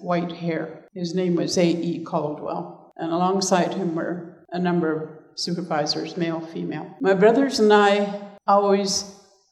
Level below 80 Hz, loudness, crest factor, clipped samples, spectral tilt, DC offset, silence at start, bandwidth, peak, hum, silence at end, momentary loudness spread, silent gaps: -70 dBFS; -22 LUFS; 18 dB; under 0.1%; -5 dB/octave; under 0.1%; 0 s; 13 kHz; -4 dBFS; none; 0.4 s; 14 LU; none